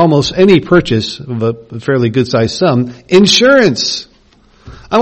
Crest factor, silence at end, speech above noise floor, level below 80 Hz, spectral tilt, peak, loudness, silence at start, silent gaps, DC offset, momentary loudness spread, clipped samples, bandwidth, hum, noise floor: 12 dB; 0 s; 36 dB; -40 dBFS; -5 dB/octave; 0 dBFS; -11 LUFS; 0 s; none; under 0.1%; 11 LU; 0.2%; 8.6 kHz; none; -47 dBFS